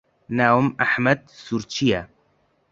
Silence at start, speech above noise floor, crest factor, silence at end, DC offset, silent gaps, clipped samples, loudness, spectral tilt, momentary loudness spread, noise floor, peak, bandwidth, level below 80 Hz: 0.3 s; 44 dB; 20 dB; 0.65 s; under 0.1%; none; under 0.1%; -21 LUFS; -5.5 dB/octave; 11 LU; -64 dBFS; -2 dBFS; 7.6 kHz; -54 dBFS